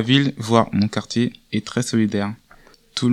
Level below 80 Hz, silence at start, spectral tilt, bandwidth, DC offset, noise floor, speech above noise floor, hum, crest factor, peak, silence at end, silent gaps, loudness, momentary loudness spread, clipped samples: -56 dBFS; 0 s; -5.5 dB/octave; 12.5 kHz; under 0.1%; -50 dBFS; 30 dB; none; 20 dB; 0 dBFS; 0 s; none; -21 LUFS; 11 LU; under 0.1%